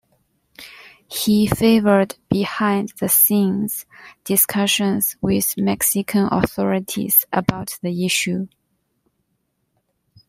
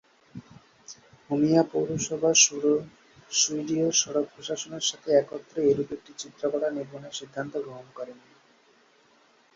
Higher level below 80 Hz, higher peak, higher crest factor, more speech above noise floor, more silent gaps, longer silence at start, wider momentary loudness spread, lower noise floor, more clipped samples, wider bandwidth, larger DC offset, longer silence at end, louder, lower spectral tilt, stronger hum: first, -50 dBFS vs -68 dBFS; first, 0 dBFS vs -6 dBFS; about the same, 20 dB vs 22 dB; first, 52 dB vs 35 dB; neither; first, 0.6 s vs 0.35 s; second, 12 LU vs 20 LU; first, -71 dBFS vs -61 dBFS; neither; first, 16 kHz vs 7.8 kHz; neither; first, 1.8 s vs 1.4 s; first, -18 LUFS vs -25 LUFS; about the same, -4 dB/octave vs -3 dB/octave; neither